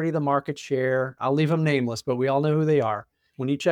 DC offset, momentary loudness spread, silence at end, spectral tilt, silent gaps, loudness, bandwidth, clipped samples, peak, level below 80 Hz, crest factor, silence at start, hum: under 0.1%; 7 LU; 0 s; -7 dB/octave; none; -24 LUFS; 11.5 kHz; under 0.1%; -10 dBFS; -68 dBFS; 14 dB; 0 s; none